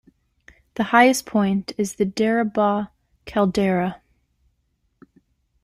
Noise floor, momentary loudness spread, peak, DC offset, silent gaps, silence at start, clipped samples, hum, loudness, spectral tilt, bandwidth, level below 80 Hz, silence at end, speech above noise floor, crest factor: -69 dBFS; 12 LU; -2 dBFS; under 0.1%; none; 0.75 s; under 0.1%; none; -21 LUFS; -5.5 dB/octave; 15.5 kHz; -56 dBFS; 1.65 s; 50 dB; 20 dB